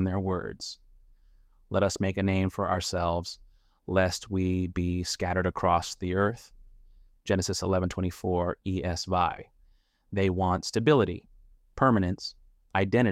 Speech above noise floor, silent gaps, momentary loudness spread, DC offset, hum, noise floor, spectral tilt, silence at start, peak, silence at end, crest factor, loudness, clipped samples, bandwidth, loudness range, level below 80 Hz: 36 dB; none; 15 LU; under 0.1%; none; -63 dBFS; -5.5 dB/octave; 0 s; -8 dBFS; 0 s; 20 dB; -28 LUFS; under 0.1%; 14.5 kHz; 3 LU; -50 dBFS